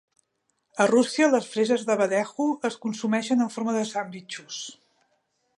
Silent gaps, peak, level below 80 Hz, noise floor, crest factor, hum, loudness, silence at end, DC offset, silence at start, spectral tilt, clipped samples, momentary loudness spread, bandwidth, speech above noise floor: none; -6 dBFS; -80 dBFS; -75 dBFS; 20 dB; none; -25 LUFS; 0.85 s; under 0.1%; 0.75 s; -4 dB/octave; under 0.1%; 15 LU; 11.5 kHz; 51 dB